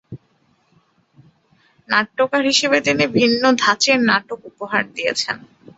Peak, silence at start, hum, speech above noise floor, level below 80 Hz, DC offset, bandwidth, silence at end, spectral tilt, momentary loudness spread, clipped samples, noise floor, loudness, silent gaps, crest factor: -2 dBFS; 0.1 s; none; 43 dB; -60 dBFS; under 0.1%; 8.2 kHz; 0.4 s; -3 dB/octave; 9 LU; under 0.1%; -61 dBFS; -17 LUFS; none; 18 dB